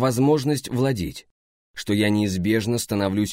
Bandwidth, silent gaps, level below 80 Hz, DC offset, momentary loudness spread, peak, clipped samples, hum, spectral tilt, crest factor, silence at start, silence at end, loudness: 16 kHz; 1.31-1.74 s; -50 dBFS; under 0.1%; 13 LU; -8 dBFS; under 0.1%; none; -5.5 dB/octave; 14 dB; 0 s; 0 s; -22 LUFS